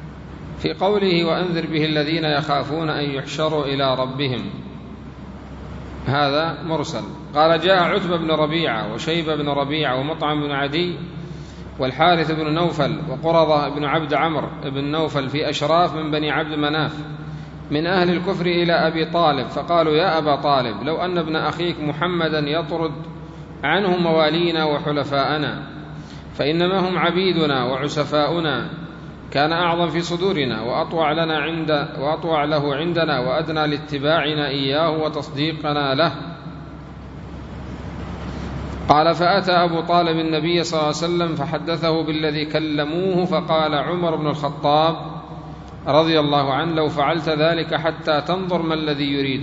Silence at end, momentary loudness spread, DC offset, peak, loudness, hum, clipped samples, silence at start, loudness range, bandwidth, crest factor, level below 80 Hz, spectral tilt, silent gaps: 0 s; 16 LU; under 0.1%; 0 dBFS; -20 LUFS; none; under 0.1%; 0 s; 4 LU; 7.8 kHz; 20 dB; -44 dBFS; -6 dB/octave; none